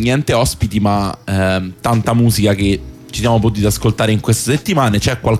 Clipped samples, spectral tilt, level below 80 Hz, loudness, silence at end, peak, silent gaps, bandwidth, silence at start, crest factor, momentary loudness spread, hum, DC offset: under 0.1%; -5.5 dB/octave; -32 dBFS; -15 LUFS; 0 s; -2 dBFS; none; 16 kHz; 0 s; 12 dB; 5 LU; none; under 0.1%